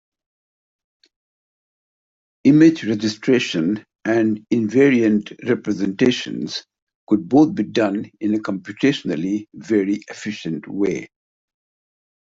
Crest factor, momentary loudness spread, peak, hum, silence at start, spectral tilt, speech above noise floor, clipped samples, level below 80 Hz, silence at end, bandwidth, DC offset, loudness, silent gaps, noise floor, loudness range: 18 dB; 12 LU; -4 dBFS; none; 2.45 s; -6 dB/octave; over 72 dB; under 0.1%; -62 dBFS; 1.25 s; 7.8 kHz; under 0.1%; -19 LUFS; 6.82-6.87 s, 6.95-7.07 s; under -90 dBFS; 6 LU